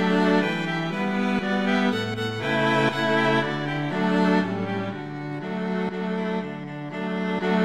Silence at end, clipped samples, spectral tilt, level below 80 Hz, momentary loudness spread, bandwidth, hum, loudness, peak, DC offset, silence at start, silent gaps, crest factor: 0 s; under 0.1%; -6.5 dB/octave; -60 dBFS; 10 LU; 11.5 kHz; none; -24 LUFS; -8 dBFS; 0.3%; 0 s; none; 16 dB